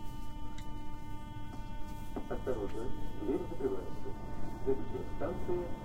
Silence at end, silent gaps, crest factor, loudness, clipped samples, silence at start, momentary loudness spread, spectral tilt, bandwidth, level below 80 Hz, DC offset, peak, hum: 0 s; none; 16 dB; -41 LUFS; under 0.1%; 0 s; 10 LU; -7.5 dB/octave; 15.5 kHz; -46 dBFS; under 0.1%; -18 dBFS; none